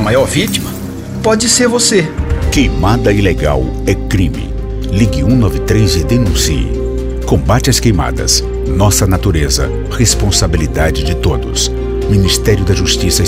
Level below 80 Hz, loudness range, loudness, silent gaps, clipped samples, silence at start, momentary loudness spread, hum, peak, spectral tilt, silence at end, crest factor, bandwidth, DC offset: -18 dBFS; 2 LU; -12 LUFS; none; under 0.1%; 0 s; 7 LU; none; 0 dBFS; -4.5 dB/octave; 0 s; 12 dB; 16.5 kHz; under 0.1%